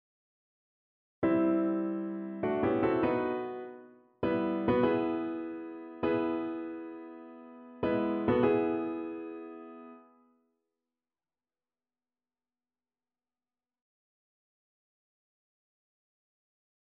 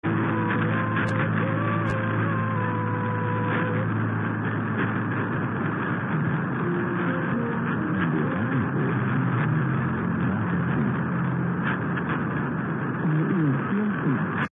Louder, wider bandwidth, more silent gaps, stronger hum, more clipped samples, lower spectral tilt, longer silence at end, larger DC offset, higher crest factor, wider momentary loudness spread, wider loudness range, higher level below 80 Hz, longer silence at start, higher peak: second, -31 LUFS vs -25 LUFS; first, 4.3 kHz vs 3.9 kHz; neither; neither; neither; second, -6.5 dB/octave vs -9.5 dB/octave; first, 6.9 s vs 0.1 s; neither; first, 20 dB vs 12 dB; first, 19 LU vs 3 LU; first, 5 LU vs 1 LU; second, -64 dBFS vs -58 dBFS; first, 1.2 s vs 0.05 s; second, -16 dBFS vs -12 dBFS